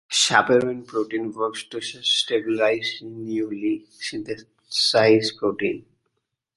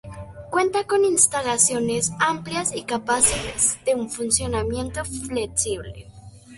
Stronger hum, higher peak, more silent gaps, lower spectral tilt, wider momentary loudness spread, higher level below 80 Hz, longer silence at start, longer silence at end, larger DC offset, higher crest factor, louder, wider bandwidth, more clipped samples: neither; about the same, -2 dBFS vs -2 dBFS; neither; about the same, -3 dB/octave vs -2.5 dB/octave; first, 14 LU vs 11 LU; second, -66 dBFS vs -44 dBFS; about the same, 0.1 s vs 0.05 s; first, 0.75 s vs 0 s; neither; about the same, 22 dB vs 22 dB; about the same, -22 LUFS vs -21 LUFS; about the same, 11.5 kHz vs 12 kHz; neither